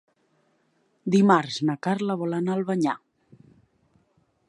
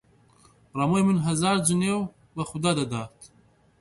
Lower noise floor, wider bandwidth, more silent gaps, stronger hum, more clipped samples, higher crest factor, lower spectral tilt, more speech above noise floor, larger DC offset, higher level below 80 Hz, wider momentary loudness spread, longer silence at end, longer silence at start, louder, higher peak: first, -68 dBFS vs -60 dBFS; about the same, 10.5 kHz vs 11.5 kHz; neither; neither; neither; about the same, 22 dB vs 20 dB; first, -6.5 dB/octave vs -5 dB/octave; first, 45 dB vs 36 dB; neither; second, -74 dBFS vs -58 dBFS; second, 9 LU vs 13 LU; first, 1.55 s vs 0.55 s; first, 1.05 s vs 0.75 s; about the same, -24 LUFS vs -25 LUFS; about the same, -6 dBFS vs -6 dBFS